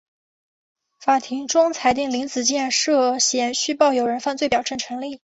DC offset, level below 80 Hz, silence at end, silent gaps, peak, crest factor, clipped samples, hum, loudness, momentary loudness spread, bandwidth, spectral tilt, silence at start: under 0.1%; -60 dBFS; 0.15 s; none; -4 dBFS; 18 dB; under 0.1%; none; -20 LUFS; 8 LU; 8.4 kHz; -1.5 dB/octave; 1 s